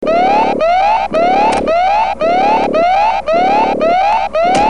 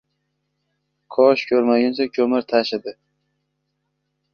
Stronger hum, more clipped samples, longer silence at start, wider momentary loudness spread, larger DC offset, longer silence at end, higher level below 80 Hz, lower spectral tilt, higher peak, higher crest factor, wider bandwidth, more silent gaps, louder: neither; neither; second, 0 s vs 1.1 s; second, 2 LU vs 11 LU; first, 2% vs under 0.1%; second, 0 s vs 1.4 s; first, -40 dBFS vs -66 dBFS; second, -4.5 dB/octave vs -6 dB/octave; about the same, 0 dBFS vs -2 dBFS; second, 10 dB vs 20 dB; first, 11 kHz vs 6.8 kHz; neither; first, -12 LUFS vs -19 LUFS